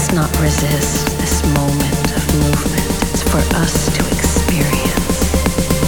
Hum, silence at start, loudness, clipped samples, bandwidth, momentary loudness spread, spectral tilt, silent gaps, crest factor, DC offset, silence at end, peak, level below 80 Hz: none; 0 s; -15 LUFS; under 0.1%; over 20 kHz; 2 LU; -4.5 dB/octave; none; 14 dB; under 0.1%; 0 s; 0 dBFS; -22 dBFS